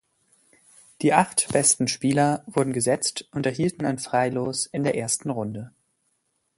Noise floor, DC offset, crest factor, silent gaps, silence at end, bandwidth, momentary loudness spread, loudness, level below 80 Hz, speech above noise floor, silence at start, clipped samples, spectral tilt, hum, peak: -73 dBFS; under 0.1%; 24 dB; none; 0.9 s; 12 kHz; 9 LU; -23 LUFS; -62 dBFS; 49 dB; 1 s; under 0.1%; -4 dB/octave; none; -2 dBFS